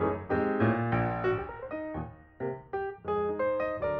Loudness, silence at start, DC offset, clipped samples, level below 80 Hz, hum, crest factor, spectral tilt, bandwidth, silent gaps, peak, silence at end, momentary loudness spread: -31 LUFS; 0 s; under 0.1%; under 0.1%; -52 dBFS; none; 18 dB; -10 dB/octave; 5.4 kHz; none; -14 dBFS; 0 s; 11 LU